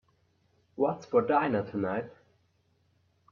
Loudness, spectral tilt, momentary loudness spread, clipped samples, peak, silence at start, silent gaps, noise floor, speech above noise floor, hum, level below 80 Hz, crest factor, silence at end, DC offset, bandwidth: -29 LUFS; -8 dB/octave; 15 LU; under 0.1%; -14 dBFS; 0.8 s; none; -71 dBFS; 42 dB; none; -72 dBFS; 20 dB; 1.2 s; under 0.1%; 6.8 kHz